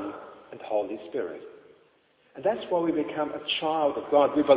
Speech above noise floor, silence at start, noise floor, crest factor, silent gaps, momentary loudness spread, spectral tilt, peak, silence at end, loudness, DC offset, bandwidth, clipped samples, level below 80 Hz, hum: 38 dB; 0 s; -64 dBFS; 20 dB; none; 20 LU; -8.5 dB/octave; -6 dBFS; 0 s; -28 LUFS; under 0.1%; 4 kHz; under 0.1%; -68 dBFS; none